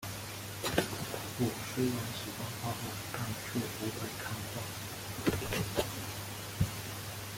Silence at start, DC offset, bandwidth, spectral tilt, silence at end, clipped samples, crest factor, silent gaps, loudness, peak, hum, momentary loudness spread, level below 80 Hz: 0 s; under 0.1%; 17 kHz; -4.5 dB/octave; 0 s; under 0.1%; 24 dB; none; -37 LUFS; -14 dBFS; none; 7 LU; -56 dBFS